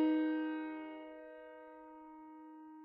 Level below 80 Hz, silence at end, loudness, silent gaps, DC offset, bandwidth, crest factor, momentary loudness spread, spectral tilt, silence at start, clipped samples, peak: -82 dBFS; 0 s; -40 LUFS; none; under 0.1%; 4.1 kHz; 16 dB; 19 LU; -2 dB/octave; 0 s; under 0.1%; -24 dBFS